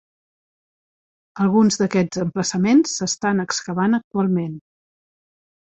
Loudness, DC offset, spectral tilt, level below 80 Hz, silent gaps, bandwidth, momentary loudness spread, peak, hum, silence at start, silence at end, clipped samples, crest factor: -20 LUFS; under 0.1%; -5 dB/octave; -60 dBFS; 4.04-4.11 s; 8.4 kHz; 7 LU; -6 dBFS; none; 1.35 s; 1.2 s; under 0.1%; 16 dB